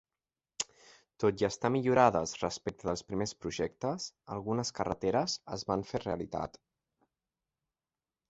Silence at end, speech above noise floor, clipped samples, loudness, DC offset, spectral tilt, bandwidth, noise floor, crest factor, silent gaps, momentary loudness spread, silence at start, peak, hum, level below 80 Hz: 1.8 s; over 57 dB; under 0.1%; -33 LUFS; under 0.1%; -4.5 dB/octave; 8.6 kHz; under -90 dBFS; 24 dB; none; 12 LU; 0.6 s; -10 dBFS; none; -60 dBFS